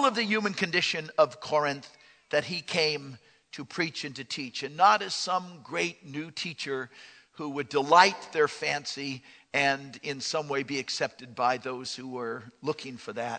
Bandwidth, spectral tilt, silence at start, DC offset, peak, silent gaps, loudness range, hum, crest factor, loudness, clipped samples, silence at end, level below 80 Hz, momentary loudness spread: 9.4 kHz; -3 dB/octave; 0 s; under 0.1%; -4 dBFS; none; 5 LU; none; 26 dB; -28 LUFS; under 0.1%; 0 s; -76 dBFS; 14 LU